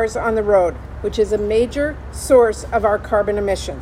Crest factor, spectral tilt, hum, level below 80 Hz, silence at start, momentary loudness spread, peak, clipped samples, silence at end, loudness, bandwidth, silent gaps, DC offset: 16 dB; -5 dB/octave; none; -34 dBFS; 0 s; 10 LU; -2 dBFS; under 0.1%; 0 s; -18 LUFS; 15.5 kHz; none; under 0.1%